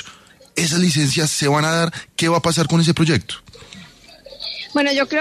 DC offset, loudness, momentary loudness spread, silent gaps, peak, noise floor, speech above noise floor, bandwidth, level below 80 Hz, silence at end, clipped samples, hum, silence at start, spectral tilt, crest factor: under 0.1%; -18 LUFS; 14 LU; none; -4 dBFS; -45 dBFS; 27 dB; 13.5 kHz; -52 dBFS; 0 s; under 0.1%; none; 0 s; -4.5 dB/octave; 14 dB